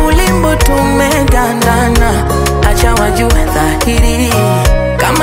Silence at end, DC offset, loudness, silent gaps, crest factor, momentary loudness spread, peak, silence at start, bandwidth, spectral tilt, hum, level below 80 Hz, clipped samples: 0 s; under 0.1%; -10 LUFS; none; 10 dB; 2 LU; 0 dBFS; 0 s; 16.5 kHz; -5 dB/octave; none; -14 dBFS; under 0.1%